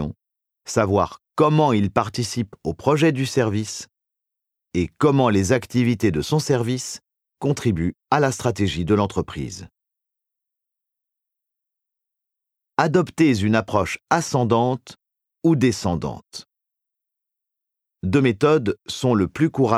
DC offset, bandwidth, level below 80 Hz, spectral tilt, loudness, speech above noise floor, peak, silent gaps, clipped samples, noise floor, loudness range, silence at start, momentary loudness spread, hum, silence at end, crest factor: under 0.1%; 15 kHz; -48 dBFS; -6 dB/octave; -21 LUFS; 64 dB; -2 dBFS; none; under 0.1%; -84 dBFS; 6 LU; 0 s; 13 LU; none; 0 s; 20 dB